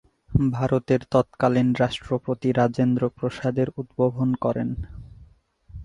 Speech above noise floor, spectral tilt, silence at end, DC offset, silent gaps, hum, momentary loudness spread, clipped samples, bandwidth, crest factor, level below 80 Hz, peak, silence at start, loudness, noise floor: 31 dB; -8 dB/octave; 0 s; under 0.1%; none; none; 7 LU; under 0.1%; 10 kHz; 18 dB; -44 dBFS; -4 dBFS; 0.3 s; -24 LUFS; -54 dBFS